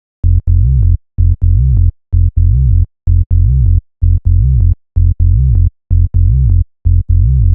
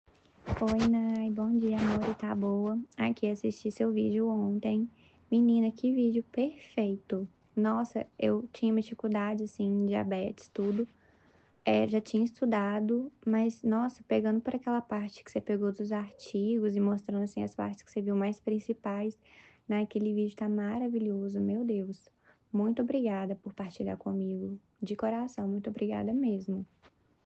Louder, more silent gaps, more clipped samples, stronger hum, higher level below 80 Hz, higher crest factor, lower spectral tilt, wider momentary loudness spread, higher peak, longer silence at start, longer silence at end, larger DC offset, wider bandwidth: first, -12 LUFS vs -32 LUFS; first, 3.26-3.30 s vs none; neither; neither; first, -12 dBFS vs -62 dBFS; second, 8 dB vs 18 dB; first, -16 dB/octave vs -8 dB/octave; second, 4 LU vs 9 LU; first, 0 dBFS vs -14 dBFS; second, 0.25 s vs 0.45 s; second, 0 s vs 0.6 s; neither; second, 0.6 kHz vs 8 kHz